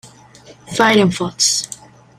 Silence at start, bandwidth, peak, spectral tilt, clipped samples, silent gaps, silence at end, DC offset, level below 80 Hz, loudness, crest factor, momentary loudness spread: 0.05 s; 15.5 kHz; 0 dBFS; -3 dB/octave; under 0.1%; none; 0.45 s; under 0.1%; -52 dBFS; -15 LUFS; 18 dB; 16 LU